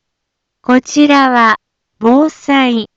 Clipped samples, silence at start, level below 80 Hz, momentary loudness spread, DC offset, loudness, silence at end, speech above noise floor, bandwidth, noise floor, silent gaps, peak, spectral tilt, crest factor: under 0.1%; 0.7 s; -56 dBFS; 8 LU; under 0.1%; -11 LUFS; 0.1 s; 64 dB; 7.8 kHz; -74 dBFS; none; 0 dBFS; -3.5 dB/octave; 12 dB